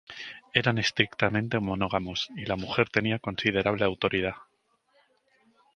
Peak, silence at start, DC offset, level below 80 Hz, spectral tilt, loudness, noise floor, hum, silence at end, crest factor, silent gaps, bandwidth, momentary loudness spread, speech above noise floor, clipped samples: -2 dBFS; 0.1 s; under 0.1%; -54 dBFS; -5 dB/octave; -27 LUFS; -71 dBFS; none; 1.35 s; 26 dB; none; 9.6 kHz; 7 LU; 43 dB; under 0.1%